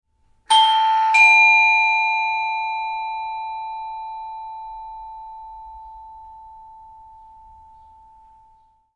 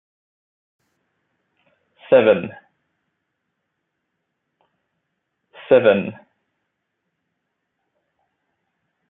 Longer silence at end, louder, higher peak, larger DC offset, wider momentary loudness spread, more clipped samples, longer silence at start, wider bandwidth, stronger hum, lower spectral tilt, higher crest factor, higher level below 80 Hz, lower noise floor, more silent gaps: second, 2.2 s vs 2.95 s; about the same, -15 LUFS vs -16 LUFS; about the same, -4 dBFS vs -2 dBFS; neither; first, 27 LU vs 15 LU; neither; second, 0.5 s vs 2.1 s; first, 11 kHz vs 4 kHz; neither; second, 2.5 dB/octave vs -9.5 dB/octave; about the same, 18 dB vs 22 dB; first, -58 dBFS vs -70 dBFS; second, -56 dBFS vs -76 dBFS; neither